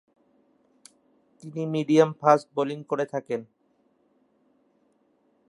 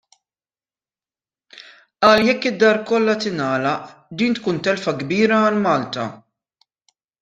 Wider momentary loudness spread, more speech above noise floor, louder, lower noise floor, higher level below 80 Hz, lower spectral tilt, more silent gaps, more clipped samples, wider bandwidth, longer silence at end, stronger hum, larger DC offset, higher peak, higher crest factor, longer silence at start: first, 14 LU vs 11 LU; second, 43 dB vs over 72 dB; second, -25 LUFS vs -18 LUFS; second, -67 dBFS vs under -90 dBFS; second, -80 dBFS vs -60 dBFS; about the same, -6.5 dB/octave vs -5.5 dB/octave; neither; neither; first, 11.5 kHz vs 9.2 kHz; first, 2.05 s vs 1.05 s; neither; neither; about the same, -4 dBFS vs -2 dBFS; first, 26 dB vs 18 dB; second, 1.45 s vs 2 s